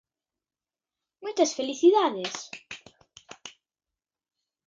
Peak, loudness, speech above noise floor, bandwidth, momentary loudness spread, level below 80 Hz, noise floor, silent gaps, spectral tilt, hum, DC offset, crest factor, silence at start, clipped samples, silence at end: -8 dBFS; -25 LUFS; over 66 dB; 7.8 kHz; 24 LU; -78 dBFS; under -90 dBFS; none; -3 dB/octave; none; under 0.1%; 20 dB; 1.2 s; under 0.1%; 1.2 s